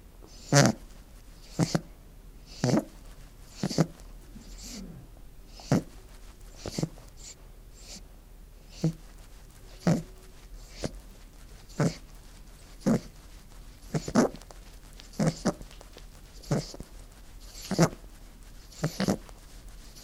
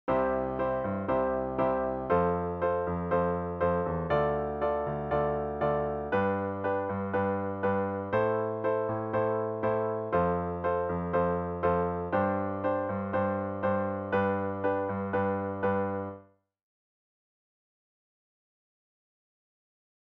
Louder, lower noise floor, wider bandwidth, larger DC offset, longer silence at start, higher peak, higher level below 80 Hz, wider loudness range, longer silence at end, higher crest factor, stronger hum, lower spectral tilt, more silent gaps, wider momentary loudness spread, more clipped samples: about the same, -30 LUFS vs -30 LUFS; second, -49 dBFS vs -54 dBFS; first, 16 kHz vs 4.4 kHz; neither; about the same, 0.05 s vs 0.05 s; first, -2 dBFS vs -14 dBFS; about the same, -48 dBFS vs -52 dBFS; about the same, 5 LU vs 4 LU; second, 0 s vs 3.85 s; first, 30 dB vs 16 dB; neither; second, -5.5 dB/octave vs -7 dB/octave; neither; first, 25 LU vs 3 LU; neither